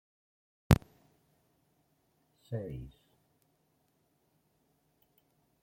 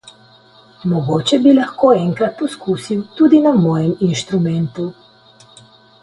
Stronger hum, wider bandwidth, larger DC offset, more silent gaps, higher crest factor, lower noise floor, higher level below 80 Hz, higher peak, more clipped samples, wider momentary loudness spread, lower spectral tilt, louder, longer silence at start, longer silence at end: neither; first, 16.5 kHz vs 11.5 kHz; neither; neither; first, 34 dB vs 16 dB; first, -75 dBFS vs -47 dBFS; about the same, -50 dBFS vs -54 dBFS; second, -6 dBFS vs 0 dBFS; neither; first, 18 LU vs 12 LU; about the same, -7 dB/octave vs -7 dB/octave; second, -33 LUFS vs -15 LUFS; second, 0.7 s vs 0.85 s; first, 2.75 s vs 1.1 s